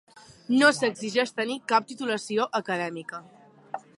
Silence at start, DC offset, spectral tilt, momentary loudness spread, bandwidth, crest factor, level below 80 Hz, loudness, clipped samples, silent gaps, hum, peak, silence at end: 0.5 s; under 0.1%; -3.5 dB/octave; 20 LU; 11.5 kHz; 22 dB; -78 dBFS; -25 LUFS; under 0.1%; none; none; -6 dBFS; 0.2 s